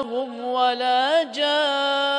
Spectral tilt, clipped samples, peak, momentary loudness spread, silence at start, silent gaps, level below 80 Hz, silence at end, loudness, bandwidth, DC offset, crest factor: -1.5 dB/octave; under 0.1%; -8 dBFS; 7 LU; 0 s; none; -76 dBFS; 0 s; -21 LUFS; 10.5 kHz; under 0.1%; 14 dB